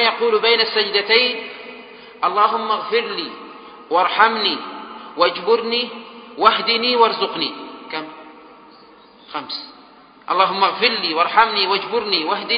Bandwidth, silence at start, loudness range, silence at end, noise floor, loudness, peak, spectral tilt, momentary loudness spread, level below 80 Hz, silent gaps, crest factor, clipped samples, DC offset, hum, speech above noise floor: 5.2 kHz; 0 s; 5 LU; 0 s; -46 dBFS; -17 LUFS; 0 dBFS; -6 dB/octave; 18 LU; -64 dBFS; none; 20 dB; under 0.1%; under 0.1%; none; 28 dB